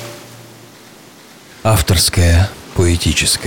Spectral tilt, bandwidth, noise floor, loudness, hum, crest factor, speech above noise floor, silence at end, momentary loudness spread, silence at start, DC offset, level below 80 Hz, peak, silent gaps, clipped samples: -4 dB/octave; 18 kHz; -40 dBFS; -14 LUFS; none; 12 dB; 28 dB; 0 s; 10 LU; 0 s; under 0.1%; -26 dBFS; -4 dBFS; none; under 0.1%